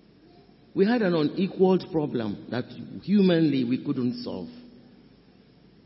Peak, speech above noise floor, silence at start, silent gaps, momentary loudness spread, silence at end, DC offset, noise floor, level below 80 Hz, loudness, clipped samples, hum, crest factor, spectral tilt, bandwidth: -10 dBFS; 31 dB; 0.75 s; none; 15 LU; 1.2 s; under 0.1%; -56 dBFS; -66 dBFS; -25 LUFS; under 0.1%; none; 18 dB; -11.5 dB/octave; 5.8 kHz